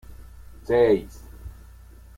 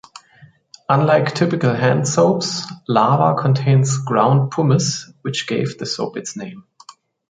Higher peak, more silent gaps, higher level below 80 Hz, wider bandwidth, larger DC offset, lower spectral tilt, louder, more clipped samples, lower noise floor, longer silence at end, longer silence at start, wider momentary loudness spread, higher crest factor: second, -10 dBFS vs -2 dBFS; neither; first, -44 dBFS vs -58 dBFS; first, 16 kHz vs 9.4 kHz; neither; first, -7 dB/octave vs -5.5 dB/octave; second, -21 LUFS vs -17 LUFS; neither; about the same, -46 dBFS vs -49 dBFS; first, 0.65 s vs 0.4 s; second, 0.1 s vs 0.9 s; first, 24 LU vs 11 LU; about the same, 18 dB vs 16 dB